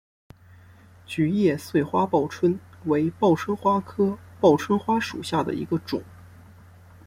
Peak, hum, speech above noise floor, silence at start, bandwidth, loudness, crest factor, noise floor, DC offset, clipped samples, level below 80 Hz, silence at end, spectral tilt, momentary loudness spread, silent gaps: -4 dBFS; none; 28 dB; 1.1 s; 16.5 kHz; -24 LUFS; 20 dB; -50 dBFS; under 0.1%; under 0.1%; -60 dBFS; 0.85 s; -7 dB/octave; 7 LU; none